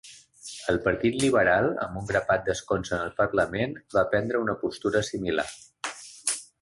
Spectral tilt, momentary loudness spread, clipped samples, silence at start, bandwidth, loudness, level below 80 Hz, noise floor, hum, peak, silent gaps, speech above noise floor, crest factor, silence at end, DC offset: -4.5 dB/octave; 13 LU; under 0.1%; 0.05 s; 12 kHz; -27 LUFS; -52 dBFS; -46 dBFS; none; -8 dBFS; none; 20 dB; 18 dB; 0.2 s; under 0.1%